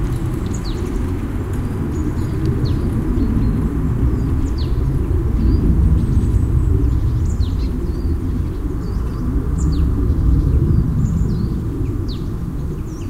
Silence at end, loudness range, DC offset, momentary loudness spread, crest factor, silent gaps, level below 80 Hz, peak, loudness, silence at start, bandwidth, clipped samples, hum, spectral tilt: 0 s; 3 LU; under 0.1%; 7 LU; 14 dB; none; -20 dBFS; -4 dBFS; -19 LUFS; 0 s; 12.5 kHz; under 0.1%; none; -8.5 dB/octave